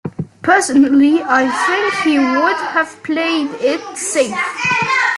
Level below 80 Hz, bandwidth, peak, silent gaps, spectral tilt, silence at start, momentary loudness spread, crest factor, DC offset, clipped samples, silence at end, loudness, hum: -58 dBFS; 12 kHz; 0 dBFS; none; -3.5 dB/octave; 0.05 s; 7 LU; 14 dB; under 0.1%; under 0.1%; 0 s; -15 LUFS; none